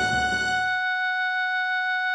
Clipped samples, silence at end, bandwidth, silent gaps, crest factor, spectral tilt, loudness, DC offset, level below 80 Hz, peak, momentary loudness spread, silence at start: under 0.1%; 0 s; 11 kHz; none; 10 dB; -2 dB/octave; -24 LUFS; under 0.1%; -50 dBFS; -14 dBFS; 1 LU; 0 s